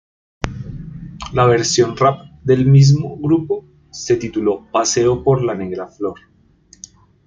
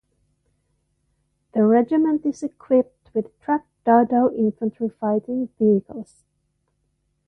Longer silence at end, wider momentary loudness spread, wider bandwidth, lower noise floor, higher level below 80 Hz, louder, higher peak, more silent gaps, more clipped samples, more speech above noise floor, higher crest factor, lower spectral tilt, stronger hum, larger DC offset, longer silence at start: second, 1.1 s vs 1.25 s; first, 18 LU vs 11 LU; second, 7.8 kHz vs 9.2 kHz; second, -50 dBFS vs -71 dBFS; first, -42 dBFS vs -64 dBFS; first, -16 LUFS vs -21 LUFS; first, 0 dBFS vs -4 dBFS; neither; neither; second, 35 dB vs 51 dB; about the same, 16 dB vs 20 dB; second, -6 dB/octave vs -9 dB/octave; neither; neither; second, 0.45 s vs 1.55 s